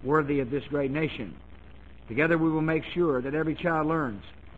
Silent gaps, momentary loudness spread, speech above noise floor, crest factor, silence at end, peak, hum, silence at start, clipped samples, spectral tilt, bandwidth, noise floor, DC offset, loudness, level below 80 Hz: none; 10 LU; 22 dB; 16 dB; 0 s; -12 dBFS; none; 0 s; under 0.1%; -9 dB/octave; 7.8 kHz; -49 dBFS; 0.3%; -27 LUFS; -50 dBFS